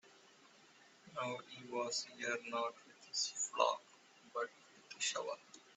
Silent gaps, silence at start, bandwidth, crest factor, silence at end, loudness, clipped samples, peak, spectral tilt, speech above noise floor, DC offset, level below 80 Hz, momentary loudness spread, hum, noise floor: none; 0.05 s; 8.2 kHz; 24 dB; 0.05 s; -41 LUFS; under 0.1%; -18 dBFS; -1 dB/octave; 24 dB; under 0.1%; under -90 dBFS; 12 LU; none; -65 dBFS